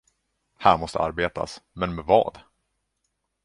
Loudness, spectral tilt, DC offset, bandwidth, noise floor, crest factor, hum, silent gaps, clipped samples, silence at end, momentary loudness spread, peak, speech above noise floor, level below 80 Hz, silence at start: -24 LUFS; -5.5 dB/octave; under 0.1%; 11.5 kHz; -77 dBFS; 24 dB; none; none; under 0.1%; 1.05 s; 11 LU; -2 dBFS; 54 dB; -48 dBFS; 0.6 s